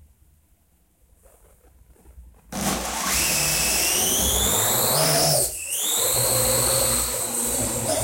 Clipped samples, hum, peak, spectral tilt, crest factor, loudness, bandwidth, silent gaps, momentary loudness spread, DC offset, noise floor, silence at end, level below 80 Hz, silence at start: under 0.1%; none; -6 dBFS; -1.5 dB/octave; 18 dB; -20 LUFS; 16.5 kHz; none; 6 LU; under 0.1%; -62 dBFS; 0 s; -40 dBFS; 2.1 s